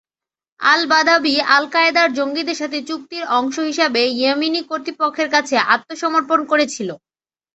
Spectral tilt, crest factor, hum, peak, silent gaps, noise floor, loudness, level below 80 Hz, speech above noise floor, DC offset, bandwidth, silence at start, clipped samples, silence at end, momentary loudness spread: -2 dB/octave; 18 dB; none; 0 dBFS; none; under -90 dBFS; -17 LUFS; -66 dBFS; over 73 dB; under 0.1%; 8.2 kHz; 0.6 s; under 0.1%; 0.6 s; 10 LU